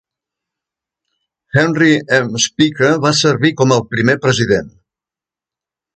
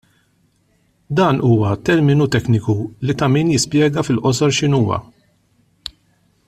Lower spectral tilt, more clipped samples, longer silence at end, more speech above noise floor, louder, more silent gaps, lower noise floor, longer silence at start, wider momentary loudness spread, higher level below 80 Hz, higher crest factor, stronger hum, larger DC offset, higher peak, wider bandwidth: second, -4.5 dB/octave vs -6 dB/octave; neither; first, 1.3 s vs 0.6 s; first, 75 dB vs 45 dB; first, -13 LUFS vs -16 LUFS; neither; first, -88 dBFS vs -60 dBFS; first, 1.55 s vs 1.1 s; second, 4 LU vs 10 LU; about the same, -50 dBFS vs -48 dBFS; about the same, 16 dB vs 14 dB; neither; neither; about the same, 0 dBFS vs -2 dBFS; second, 9.2 kHz vs 13.5 kHz